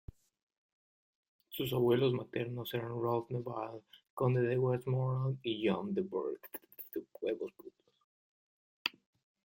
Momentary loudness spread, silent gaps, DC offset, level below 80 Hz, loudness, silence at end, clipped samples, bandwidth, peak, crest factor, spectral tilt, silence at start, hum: 14 LU; 4.10-4.17 s, 8.04-8.85 s; under 0.1%; -68 dBFS; -36 LUFS; 0.55 s; under 0.1%; 16.5 kHz; -14 dBFS; 22 dB; -7.5 dB/octave; 1.5 s; none